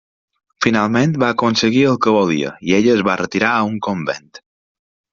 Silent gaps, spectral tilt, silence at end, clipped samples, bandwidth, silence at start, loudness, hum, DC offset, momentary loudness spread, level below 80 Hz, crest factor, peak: none; -5.5 dB/octave; 0.75 s; under 0.1%; 7.6 kHz; 0.6 s; -16 LUFS; none; under 0.1%; 8 LU; -54 dBFS; 16 dB; 0 dBFS